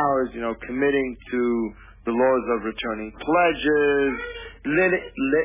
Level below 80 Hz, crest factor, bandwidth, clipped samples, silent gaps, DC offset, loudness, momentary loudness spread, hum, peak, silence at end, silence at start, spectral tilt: -48 dBFS; 14 dB; 3.8 kHz; under 0.1%; none; under 0.1%; -23 LUFS; 11 LU; none; -8 dBFS; 0 s; 0 s; -9.5 dB/octave